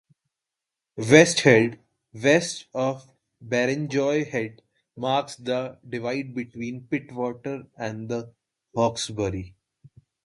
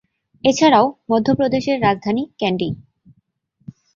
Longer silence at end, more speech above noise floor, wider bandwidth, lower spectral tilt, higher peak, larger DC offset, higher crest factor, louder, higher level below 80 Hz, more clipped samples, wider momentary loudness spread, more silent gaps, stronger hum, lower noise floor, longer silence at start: second, 0.75 s vs 1.2 s; first, 63 dB vs 47 dB; first, 11.5 kHz vs 7.6 kHz; about the same, -4.5 dB/octave vs -5.5 dB/octave; about the same, 0 dBFS vs -2 dBFS; neither; first, 26 dB vs 18 dB; second, -24 LUFS vs -18 LUFS; about the same, -58 dBFS vs -54 dBFS; neither; first, 17 LU vs 10 LU; neither; neither; first, -87 dBFS vs -63 dBFS; first, 0.95 s vs 0.45 s